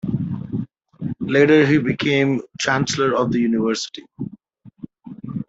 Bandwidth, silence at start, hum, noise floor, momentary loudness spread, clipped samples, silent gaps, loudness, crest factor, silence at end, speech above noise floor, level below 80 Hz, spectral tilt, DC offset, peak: 8 kHz; 0.05 s; none; -47 dBFS; 22 LU; under 0.1%; none; -19 LUFS; 16 dB; 0.05 s; 29 dB; -56 dBFS; -5.5 dB/octave; under 0.1%; -4 dBFS